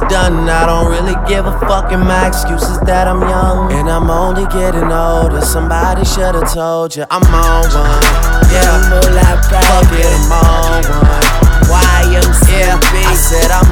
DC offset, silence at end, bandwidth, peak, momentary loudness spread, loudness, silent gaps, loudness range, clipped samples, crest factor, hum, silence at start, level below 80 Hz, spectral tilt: under 0.1%; 0 s; 19.5 kHz; 0 dBFS; 5 LU; -11 LUFS; none; 3 LU; 0.7%; 8 dB; none; 0 s; -10 dBFS; -4.5 dB/octave